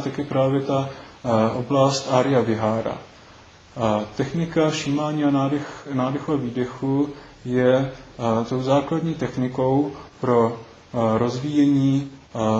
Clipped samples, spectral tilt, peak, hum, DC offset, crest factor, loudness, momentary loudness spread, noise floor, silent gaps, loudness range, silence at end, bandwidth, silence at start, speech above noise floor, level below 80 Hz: under 0.1%; -6.5 dB/octave; -4 dBFS; none; under 0.1%; 18 dB; -22 LUFS; 9 LU; -47 dBFS; none; 2 LU; 0 s; 8 kHz; 0 s; 26 dB; -54 dBFS